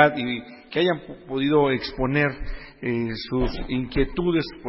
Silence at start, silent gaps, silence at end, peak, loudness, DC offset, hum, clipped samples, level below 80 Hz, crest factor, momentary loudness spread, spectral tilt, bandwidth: 0 s; none; 0 s; -2 dBFS; -24 LUFS; under 0.1%; none; under 0.1%; -38 dBFS; 22 dB; 11 LU; -10.5 dB/octave; 5.8 kHz